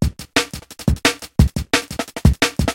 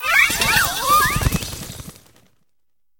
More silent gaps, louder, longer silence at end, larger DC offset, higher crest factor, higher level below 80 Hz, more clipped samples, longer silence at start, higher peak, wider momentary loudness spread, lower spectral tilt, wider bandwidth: neither; second, -19 LUFS vs -16 LUFS; second, 0 s vs 1.1 s; second, under 0.1% vs 0.1%; about the same, 18 dB vs 20 dB; first, -26 dBFS vs -34 dBFS; neither; about the same, 0 s vs 0 s; about the same, 0 dBFS vs -2 dBFS; second, 7 LU vs 18 LU; first, -4.5 dB/octave vs -2 dB/octave; second, 17 kHz vs 19 kHz